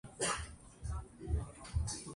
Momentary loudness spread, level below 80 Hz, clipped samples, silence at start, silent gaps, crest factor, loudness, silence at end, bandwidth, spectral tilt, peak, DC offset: 10 LU; -44 dBFS; under 0.1%; 0.05 s; none; 18 dB; -41 LUFS; 0 s; 11.5 kHz; -3.5 dB/octave; -22 dBFS; under 0.1%